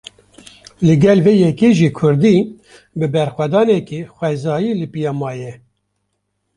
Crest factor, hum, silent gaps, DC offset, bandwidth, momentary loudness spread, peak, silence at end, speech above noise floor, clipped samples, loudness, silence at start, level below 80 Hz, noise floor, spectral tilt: 14 dB; 50 Hz at -40 dBFS; none; under 0.1%; 11 kHz; 15 LU; -2 dBFS; 1 s; 56 dB; under 0.1%; -15 LUFS; 0.8 s; -52 dBFS; -70 dBFS; -7.5 dB/octave